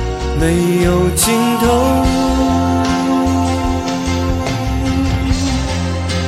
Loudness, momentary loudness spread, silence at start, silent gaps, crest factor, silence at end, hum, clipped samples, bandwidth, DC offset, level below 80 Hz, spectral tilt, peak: -15 LUFS; 5 LU; 0 s; none; 14 dB; 0 s; none; under 0.1%; 16 kHz; under 0.1%; -24 dBFS; -5.5 dB/octave; 0 dBFS